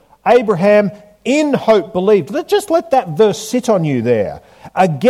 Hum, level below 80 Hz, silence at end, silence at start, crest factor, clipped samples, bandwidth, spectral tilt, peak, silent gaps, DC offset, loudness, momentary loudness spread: none; -54 dBFS; 0 s; 0.25 s; 14 dB; under 0.1%; 15 kHz; -6 dB/octave; 0 dBFS; none; under 0.1%; -14 LUFS; 8 LU